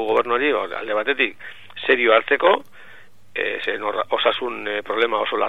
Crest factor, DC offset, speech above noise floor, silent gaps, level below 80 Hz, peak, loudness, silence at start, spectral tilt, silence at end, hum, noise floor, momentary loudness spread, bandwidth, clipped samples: 20 dB; 0.9%; 28 dB; none; -68 dBFS; 0 dBFS; -20 LUFS; 0 s; -4.5 dB/octave; 0 s; none; -49 dBFS; 10 LU; 8.2 kHz; under 0.1%